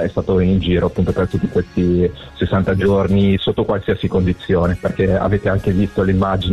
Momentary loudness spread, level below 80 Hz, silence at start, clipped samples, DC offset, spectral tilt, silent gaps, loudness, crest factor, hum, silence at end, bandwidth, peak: 4 LU; -34 dBFS; 0 s; under 0.1%; under 0.1%; -8.5 dB/octave; none; -17 LUFS; 10 dB; none; 0 s; 8.2 kHz; -6 dBFS